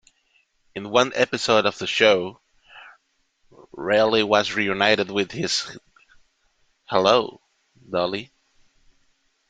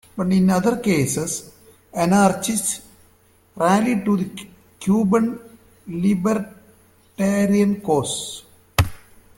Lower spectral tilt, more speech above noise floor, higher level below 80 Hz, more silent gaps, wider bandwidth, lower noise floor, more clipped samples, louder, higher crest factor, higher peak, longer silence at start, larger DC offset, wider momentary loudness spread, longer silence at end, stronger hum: second, -3.5 dB/octave vs -5.5 dB/octave; first, 46 dB vs 37 dB; second, -62 dBFS vs -46 dBFS; neither; second, 9.4 kHz vs 16.5 kHz; first, -67 dBFS vs -56 dBFS; neither; about the same, -21 LUFS vs -20 LUFS; about the same, 22 dB vs 20 dB; about the same, -2 dBFS vs -2 dBFS; first, 0.75 s vs 0.15 s; neither; about the same, 15 LU vs 13 LU; first, 1.25 s vs 0.4 s; neither